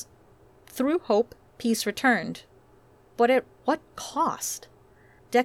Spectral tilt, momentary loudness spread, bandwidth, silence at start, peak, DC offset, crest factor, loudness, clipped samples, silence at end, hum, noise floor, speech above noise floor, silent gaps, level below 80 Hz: -3.5 dB/octave; 15 LU; 17.5 kHz; 0 s; -10 dBFS; under 0.1%; 18 dB; -26 LUFS; under 0.1%; 0 s; none; -57 dBFS; 32 dB; none; -64 dBFS